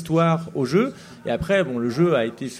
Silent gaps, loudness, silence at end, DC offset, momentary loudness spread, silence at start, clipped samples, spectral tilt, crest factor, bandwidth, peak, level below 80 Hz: none; -22 LUFS; 0 s; under 0.1%; 7 LU; 0 s; under 0.1%; -7 dB/octave; 16 dB; 13.5 kHz; -6 dBFS; -50 dBFS